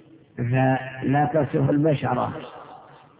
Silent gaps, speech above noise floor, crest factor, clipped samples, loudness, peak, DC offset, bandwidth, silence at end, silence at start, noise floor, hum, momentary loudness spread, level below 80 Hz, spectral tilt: none; 25 dB; 14 dB; under 0.1%; -23 LUFS; -10 dBFS; under 0.1%; 4 kHz; 0.4 s; 0.35 s; -46 dBFS; none; 18 LU; -54 dBFS; -12 dB/octave